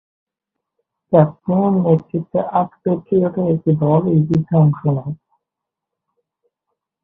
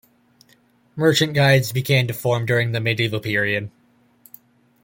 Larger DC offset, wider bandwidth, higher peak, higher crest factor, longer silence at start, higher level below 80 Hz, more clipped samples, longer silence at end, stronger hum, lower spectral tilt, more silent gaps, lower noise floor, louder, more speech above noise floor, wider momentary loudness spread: neither; second, 3.8 kHz vs 17 kHz; first, 0 dBFS vs -4 dBFS; about the same, 18 dB vs 18 dB; first, 1.1 s vs 0.95 s; about the same, -54 dBFS vs -56 dBFS; neither; first, 1.9 s vs 1.15 s; neither; first, -12 dB/octave vs -5 dB/octave; neither; first, -83 dBFS vs -58 dBFS; about the same, -17 LUFS vs -19 LUFS; first, 67 dB vs 39 dB; about the same, 7 LU vs 7 LU